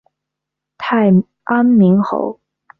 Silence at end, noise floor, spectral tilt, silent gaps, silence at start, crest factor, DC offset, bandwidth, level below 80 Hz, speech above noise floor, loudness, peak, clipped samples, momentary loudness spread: 0.5 s; -81 dBFS; -10 dB/octave; none; 0.8 s; 14 dB; under 0.1%; 5.2 kHz; -58 dBFS; 69 dB; -14 LUFS; -2 dBFS; under 0.1%; 12 LU